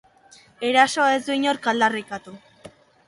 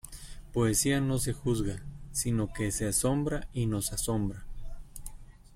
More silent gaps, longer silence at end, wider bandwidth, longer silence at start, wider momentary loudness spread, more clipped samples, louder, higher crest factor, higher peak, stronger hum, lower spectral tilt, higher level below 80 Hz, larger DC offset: neither; first, 0.4 s vs 0 s; second, 11.5 kHz vs 16.5 kHz; first, 0.6 s vs 0.05 s; second, 14 LU vs 20 LU; neither; first, -20 LUFS vs -30 LUFS; about the same, 20 dB vs 18 dB; first, -2 dBFS vs -14 dBFS; neither; second, -2.5 dB/octave vs -4.5 dB/octave; second, -68 dBFS vs -42 dBFS; neither